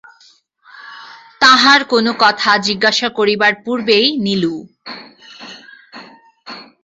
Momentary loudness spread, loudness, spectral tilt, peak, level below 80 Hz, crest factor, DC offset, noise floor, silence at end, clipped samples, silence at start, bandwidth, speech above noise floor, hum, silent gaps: 25 LU; -12 LUFS; -3 dB/octave; 0 dBFS; -60 dBFS; 16 dB; under 0.1%; -51 dBFS; 0.2 s; under 0.1%; 0.75 s; 8 kHz; 36 dB; none; none